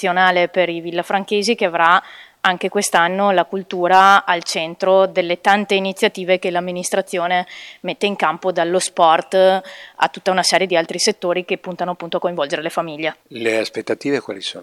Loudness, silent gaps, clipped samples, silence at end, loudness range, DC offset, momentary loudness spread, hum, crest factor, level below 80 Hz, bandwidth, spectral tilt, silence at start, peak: -17 LUFS; none; under 0.1%; 0 s; 5 LU; under 0.1%; 9 LU; none; 18 dB; -68 dBFS; 15 kHz; -3 dB/octave; 0 s; 0 dBFS